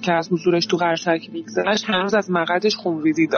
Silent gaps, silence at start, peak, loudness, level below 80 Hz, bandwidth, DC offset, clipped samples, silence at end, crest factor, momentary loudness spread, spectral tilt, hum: none; 0 s; -6 dBFS; -20 LUFS; -64 dBFS; 6.8 kHz; under 0.1%; under 0.1%; 0 s; 14 dB; 4 LU; -3.5 dB/octave; none